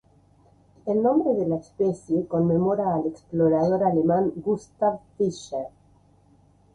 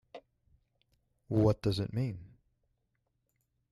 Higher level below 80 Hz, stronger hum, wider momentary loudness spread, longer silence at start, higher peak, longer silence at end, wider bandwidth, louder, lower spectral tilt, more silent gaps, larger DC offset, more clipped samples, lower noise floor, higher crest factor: about the same, -58 dBFS vs -58 dBFS; neither; about the same, 8 LU vs 10 LU; first, 0.85 s vs 0.15 s; first, -10 dBFS vs -16 dBFS; second, 1.05 s vs 1.45 s; second, 10 kHz vs 12 kHz; first, -24 LUFS vs -32 LUFS; about the same, -8.5 dB/octave vs -8 dB/octave; neither; neither; neither; second, -58 dBFS vs -80 dBFS; about the same, 16 dB vs 20 dB